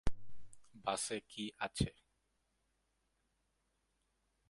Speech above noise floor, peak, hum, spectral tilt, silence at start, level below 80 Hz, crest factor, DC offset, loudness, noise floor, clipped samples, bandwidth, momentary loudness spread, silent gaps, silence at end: 41 dB; -18 dBFS; none; -4 dB/octave; 0.05 s; -54 dBFS; 24 dB; under 0.1%; -41 LUFS; -82 dBFS; under 0.1%; 11.5 kHz; 7 LU; none; 2.6 s